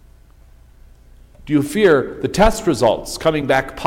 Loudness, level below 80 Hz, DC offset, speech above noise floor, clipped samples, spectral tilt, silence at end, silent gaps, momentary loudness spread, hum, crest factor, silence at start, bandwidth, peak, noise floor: -17 LUFS; -32 dBFS; under 0.1%; 30 dB; under 0.1%; -5 dB/octave; 0 s; none; 6 LU; none; 16 dB; 1.4 s; 17 kHz; -2 dBFS; -46 dBFS